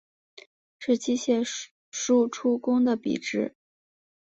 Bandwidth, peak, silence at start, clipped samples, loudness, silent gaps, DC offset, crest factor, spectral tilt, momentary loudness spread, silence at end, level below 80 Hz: 8 kHz; -12 dBFS; 0.8 s; under 0.1%; -26 LUFS; 1.71-1.92 s; under 0.1%; 16 dB; -4 dB/octave; 11 LU; 0.8 s; -72 dBFS